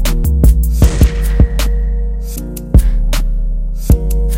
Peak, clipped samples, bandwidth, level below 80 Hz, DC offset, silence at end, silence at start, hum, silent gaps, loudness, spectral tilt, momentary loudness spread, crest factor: 0 dBFS; 0.6%; 16.5 kHz; -12 dBFS; under 0.1%; 0 s; 0 s; none; none; -15 LUFS; -6 dB/octave; 10 LU; 12 dB